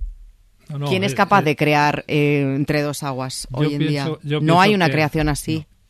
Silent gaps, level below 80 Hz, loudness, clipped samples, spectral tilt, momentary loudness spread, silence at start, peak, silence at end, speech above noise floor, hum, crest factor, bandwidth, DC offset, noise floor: none; -40 dBFS; -19 LUFS; under 0.1%; -5.5 dB/octave; 11 LU; 0 s; -2 dBFS; 0.25 s; 28 dB; none; 16 dB; 14 kHz; under 0.1%; -46 dBFS